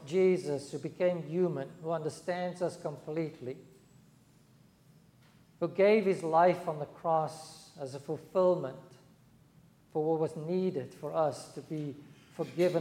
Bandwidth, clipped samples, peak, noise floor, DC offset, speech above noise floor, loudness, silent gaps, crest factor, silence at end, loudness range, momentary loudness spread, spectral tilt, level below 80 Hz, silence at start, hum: 14 kHz; under 0.1%; -14 dBFS; -62 dBFS; under 0.1%; 31 dB; -32 LUFS; none; 18 dB; 0 s; 8 LU; 17 LU; -7 dB/octave; -76 dBFS; 0 s; none